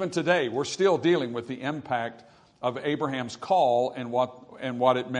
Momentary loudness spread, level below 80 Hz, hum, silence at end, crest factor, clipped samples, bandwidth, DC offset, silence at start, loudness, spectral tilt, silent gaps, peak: 10 LU; -72 dBFS; none; 0 s; 18 dB; under 0.1%; 10.5 kHz; under 0.1%; 0 s; -27 LUFS; -5 dB/octave; none; -8 dBFS